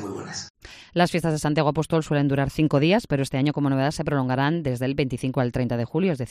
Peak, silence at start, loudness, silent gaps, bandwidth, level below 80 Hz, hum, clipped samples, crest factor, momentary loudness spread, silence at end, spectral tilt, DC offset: -6 dBFS; 0 s; -23 LUFS; 0.50-0.54 s; 14.5 kHz; -48 dBFS; none; under 0.1%; 18 dB; 6 LU; 0 s; -6.5 dB/octave; under 0.1%